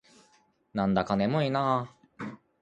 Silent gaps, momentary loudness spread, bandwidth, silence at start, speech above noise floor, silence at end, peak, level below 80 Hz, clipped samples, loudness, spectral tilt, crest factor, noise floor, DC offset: none; 15 LU; 8.6 kHz; 0.75 s; 39 dB; 0.25 s; -10 dBFS; -60 dBFS; under 0.1%; -28 LUFS; -7.5 dB/octave; 20 dB; -66 dBFS; under 0.1%